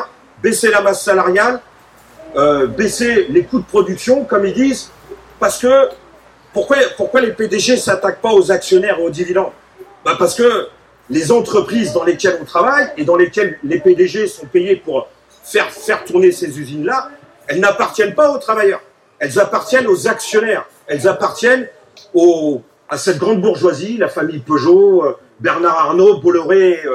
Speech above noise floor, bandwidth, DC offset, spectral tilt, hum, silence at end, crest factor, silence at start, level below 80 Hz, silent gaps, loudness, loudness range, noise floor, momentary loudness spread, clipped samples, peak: 31 dB; 14.5 kHz; under 0.1%; -4.5 dB/octave; none; 0 s; 14 dB; 0 s; -52 dBFS; none; -14 LUFS; 2 LU; -44 dBFS; 9 LU; under 0.1%; 0 dBFS